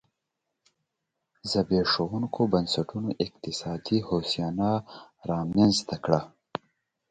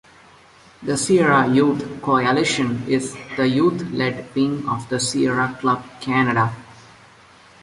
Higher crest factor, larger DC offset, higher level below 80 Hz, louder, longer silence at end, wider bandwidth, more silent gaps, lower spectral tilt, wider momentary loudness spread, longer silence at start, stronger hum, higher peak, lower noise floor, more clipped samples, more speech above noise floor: first, 24 dB vs 16 dB; neither; about the same, -56 dBFS vs -56 dBFS; second, -27 LUFS vs -20 LUFS; about the same, 0.85 s vs 0.9 s; second, 9.4 kHz vs 11.5 kHz; neither; about the same, -5.5 dB/octave vs -5 dB/octave; first, 16 LU vs 9 LU; first, 1.45 s vs 0.8 s; neither; about the same, -6 dBFS vs -4 dBFS; first, -83 dBFS vs -49 dBFS; neither; first, 56 dB vs 29 dB